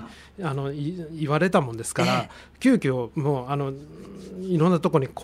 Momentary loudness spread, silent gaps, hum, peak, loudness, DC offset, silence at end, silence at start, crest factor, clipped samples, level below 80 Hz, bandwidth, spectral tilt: 18 LU; none; none; -6 dBFS; -24 LUFS; under 0.1%; 0 s; 0 s; 20 dB; under 0.1%; -54 dBFS; 15 kHz; -6.5 dB/octave